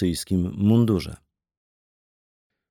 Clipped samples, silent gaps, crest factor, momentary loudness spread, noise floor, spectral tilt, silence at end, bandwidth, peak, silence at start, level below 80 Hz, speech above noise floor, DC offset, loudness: under 0.1%; none; 16 dB; 7 LU; under -90 dBFS; -7 dB/octave; 1.55 s; 17.5 kHz; -8 dBFS; 0 s; -48 dBFS; over 68 dB; under 0.1%; -22 LUFS